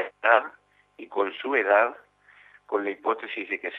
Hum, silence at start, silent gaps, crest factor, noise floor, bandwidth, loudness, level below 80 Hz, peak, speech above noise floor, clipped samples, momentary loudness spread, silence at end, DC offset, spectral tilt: 50 Hz at -70 dBFS; 0 s; none; 22 dB; -56 dBFS; 5.8 kHz; -25 LUFS; -80 dBFS; -4 dBFS; 31 dB; under 0.1%; 10 LU; 0 s; under 0.1%; -5 dB/octave